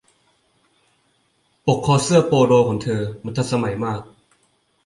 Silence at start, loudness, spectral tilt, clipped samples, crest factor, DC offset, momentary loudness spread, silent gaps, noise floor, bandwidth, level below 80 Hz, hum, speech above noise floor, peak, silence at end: 1.65 s; -19 LUFS; -6 dB/octave; under 0.1%; 18 dB; under 0.1%; 11 LU; none; -64 dBFS; 11.5 kHz; -52 dBFS; none; 46 dB; -2 dBFS; 0.8 s